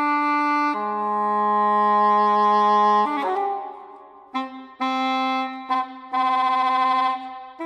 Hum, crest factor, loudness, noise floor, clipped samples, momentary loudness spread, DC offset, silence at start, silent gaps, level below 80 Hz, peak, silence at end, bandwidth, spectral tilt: none; 12 dB; -21 LUFS; -44 dBFS; under 0.1%; 13 LU; under 0.1%; 0 s; none; -76 dBFS; -10 dBFS; 0 s; 9 kHz; -5 dB/octave